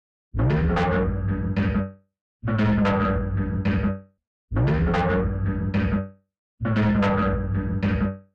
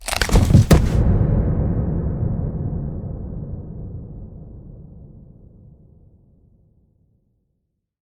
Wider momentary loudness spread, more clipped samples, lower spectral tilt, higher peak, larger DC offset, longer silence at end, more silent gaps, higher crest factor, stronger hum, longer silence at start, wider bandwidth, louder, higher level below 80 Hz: second, 8 LU vs 25 LU; neither; first, -9 dB/octave vs -6.5 dB/octave; second, -14 dBFS vs 0 dBFS; neither; second, 0.15 s vs 2.8 s; first, 2.21-2.40 s, 4.27-4.48 s, 6.39-6.58 s vs none; second, 10 dB vs 20 dB; neither; first, 0.35 s vs 0 s; second, 6.8 kHz vs over 20 kHz; second, -24 LUFS vs -19 LUFS; second, -32 dBFS vs -26 dBFS